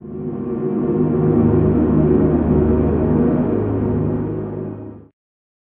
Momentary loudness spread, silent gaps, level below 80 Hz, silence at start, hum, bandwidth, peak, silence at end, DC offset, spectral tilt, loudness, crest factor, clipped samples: 12 LU; none; -30 dBFS; 0.05 s; none; 3.4 kHz; -2 dBFS; 0.65 s; under 0.1%; -11.5 dB/octave; -17 LUFS; 14 dB; under 0.1%